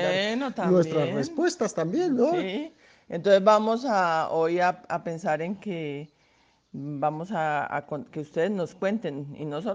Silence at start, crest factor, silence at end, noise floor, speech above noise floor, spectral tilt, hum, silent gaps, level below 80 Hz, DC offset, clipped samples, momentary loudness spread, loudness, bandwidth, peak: 0 s; 20 dB; 0 s; -64 dBFS; 38 dB; -6 dB/octave; none; none; -70 dBFS; under 0.1%; under 0.1%; 13 LU; -26 LUFS; 9.8 kHz; -6 dBFS